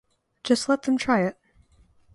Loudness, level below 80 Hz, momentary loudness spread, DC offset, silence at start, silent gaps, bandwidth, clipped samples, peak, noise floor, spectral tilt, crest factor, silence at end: -24 LUFS; -60 dBFS; 7 LU; under 0.1%; 0.45 s; none; 11.5 kHz; under 0.1%; -6 dBFS; -59 dBFS; -4.5 dB/octave; 20 dB; 0.85 s